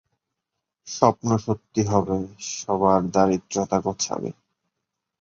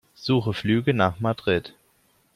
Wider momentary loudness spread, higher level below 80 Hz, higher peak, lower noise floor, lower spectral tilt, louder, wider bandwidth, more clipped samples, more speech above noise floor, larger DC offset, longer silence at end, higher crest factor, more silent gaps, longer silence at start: first, 11 LU vs 4 LU; about the same, -52 dBFS vs -56 dBFS; first, -2 dBFS vs -6 dBFS; first, -83 dBFS vs -64 dBFS; second, -5.5 dB/octave vs -7.5 dB/octave; about the same, -23 LUFS vs -24 LUFS; second, 7.8 kHz vs 14 kHz; neither; first, 60 dB vs 41 dB; neither; first, 0.9 s vs 0.65 s; about the same, 22 dB vs 20 dB; neither; first, 0.85 s vs 0.2 s